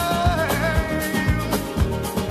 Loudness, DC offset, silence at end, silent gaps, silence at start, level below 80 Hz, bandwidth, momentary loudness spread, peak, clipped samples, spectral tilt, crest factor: -22 LUFS; under 0.1%; 0 s; none; 0 s; -28 dBFS; 14 kHz; 4 LU; -6 dBFS; under 0.1%; -5.5 dB/octave; 16 dB